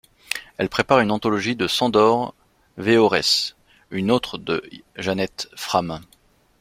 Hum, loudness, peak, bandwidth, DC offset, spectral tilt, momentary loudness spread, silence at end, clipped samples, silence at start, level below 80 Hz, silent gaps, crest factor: none; -21 LUFS; -2 dBFS; 16.5 kHz; under 0.1%; -4.5 dB/octave; 13 LU; 0.6 s; under 0.1%; 0.3 s; -54 dBFS; none; 20 dB